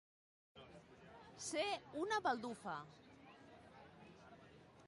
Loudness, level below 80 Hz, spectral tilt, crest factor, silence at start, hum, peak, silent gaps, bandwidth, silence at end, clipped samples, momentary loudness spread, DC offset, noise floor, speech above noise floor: -43 LUFS; -78 dBFS; -3 dB/octave; 22 dB; 0.55 s; none; -26 dBFS; none; 11.5 kHz; 0 s; under 0.1%; 22 LU; under 0.1%; -64 dBFS; 21 dB